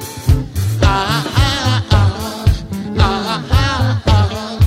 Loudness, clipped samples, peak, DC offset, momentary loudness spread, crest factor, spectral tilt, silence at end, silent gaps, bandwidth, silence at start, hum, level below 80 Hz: -15 LUFS; under 0.1%; 0 dBFS; under 0.1%; 5 LU; 14 dB; -5.5 dB/octave; 0 s; none; 16 kHz; 0 s; none; -22 dBFS